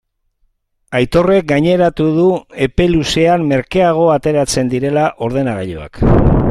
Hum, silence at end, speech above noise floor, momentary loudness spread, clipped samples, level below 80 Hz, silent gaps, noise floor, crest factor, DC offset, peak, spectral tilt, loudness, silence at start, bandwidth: none; 0 s; 48 dB; 6 LU; under 0.1%; -28 dBFS; none; -61 dBFS; 12 dB; under 0.1%; 0 dBFS; -6 dB/octave; -14 LUFS; 0.9 s; 13.5 kHz